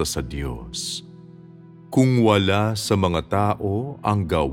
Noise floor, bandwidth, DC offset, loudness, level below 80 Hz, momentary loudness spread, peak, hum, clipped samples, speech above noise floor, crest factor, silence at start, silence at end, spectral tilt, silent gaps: -44 dBFS; 16.5 kHz; under 0.1%; -22 LUFS; -40 dBFS; 12 LU; -2 dBFS; none; under 0.1%; 23 dB; 20 dB; 0 s; 0 s; -5.5 dB/octave; none